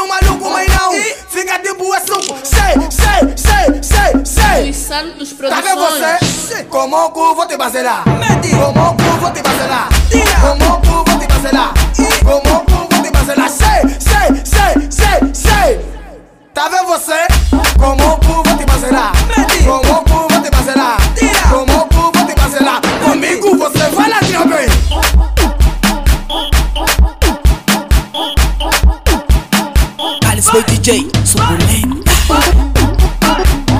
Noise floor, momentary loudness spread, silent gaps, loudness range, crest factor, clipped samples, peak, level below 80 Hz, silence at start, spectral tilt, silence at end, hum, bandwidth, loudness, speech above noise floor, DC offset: -35 dBFS; 5 LU; none; 2 LU; 10 dB; under 0.1%; 0 dBFS; -14 dBFS; 0 s; -4.5 dB/octave; 0 s; none; 16 kHz; -11 LUFS; 25 dB; under 0.1%